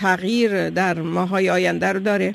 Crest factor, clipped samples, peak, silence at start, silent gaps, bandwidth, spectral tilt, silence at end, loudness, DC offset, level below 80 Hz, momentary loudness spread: 14 dB; under 0.1%; -6 dBFS; 0 s; none; 14 kHz; -5.5 dB/octave; 0 s; -20 LUFS; under 0.1%; -60 dBFS; 2 LU